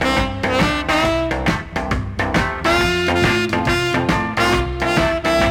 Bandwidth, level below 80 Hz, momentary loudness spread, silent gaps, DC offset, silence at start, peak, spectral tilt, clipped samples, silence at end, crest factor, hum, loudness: 17 kHz; -30 dBFS; 4 LU; none; under 0.1%; 0 s; -6 dBFS; -5 dB/octave; under 0.1%; 0 s; 12 dB; none; -18 LUFS